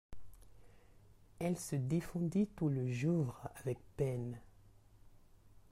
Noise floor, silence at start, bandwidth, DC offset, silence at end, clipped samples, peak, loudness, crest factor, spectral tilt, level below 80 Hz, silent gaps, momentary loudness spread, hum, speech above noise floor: -63 dBFS; 0.1 s; 15.5 kHz; under 0.1%; 0.2 s; under 0.1%; -24 dBFS; -38 LUFS; 16 dB; -7.5 dB/octave; -62 dBFS; none; 8 LU; none; 26 dB